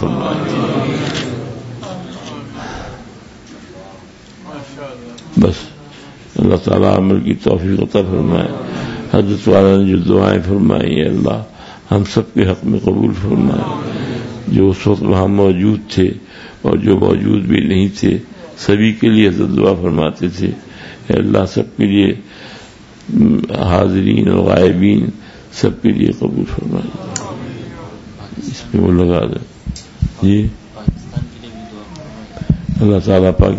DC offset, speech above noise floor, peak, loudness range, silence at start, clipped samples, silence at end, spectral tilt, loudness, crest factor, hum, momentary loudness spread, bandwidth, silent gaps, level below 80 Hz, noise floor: under 0.1%; 25 dB; 0 dBFS; 9 LU; 0 s; under 0.1%; 0 s; -7.5 dB/octave; -14 LUFS; 14 dB; none; 20 LU; 8 kHz; none; -34 dBFS; -38 dBFS